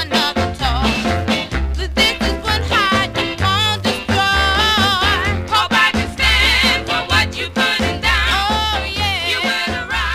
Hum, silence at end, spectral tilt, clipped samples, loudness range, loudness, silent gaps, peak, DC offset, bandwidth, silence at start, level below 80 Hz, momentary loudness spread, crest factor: none; 0 s; -3.5 dB/octave; under 0.1%; 3 LU; -15 LUFS; none; -2 dBFS; 0.2%; 16 kHz; 0 s; -26 dBFS; 6 LU; 14 dB